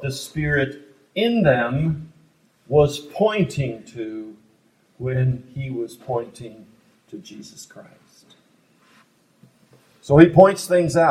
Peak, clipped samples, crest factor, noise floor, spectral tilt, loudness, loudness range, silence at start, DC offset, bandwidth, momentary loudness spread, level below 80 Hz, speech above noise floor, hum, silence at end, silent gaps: 0 dBFS; under 0.1%; 22 dB; -60 dBFS; -6.5 dB/octave; -20 LUFS; 15 LU; 0 s; under 0.1%; 15 kHz; 26 LU; -48 dBFS; 41 dB; none; 0 s; none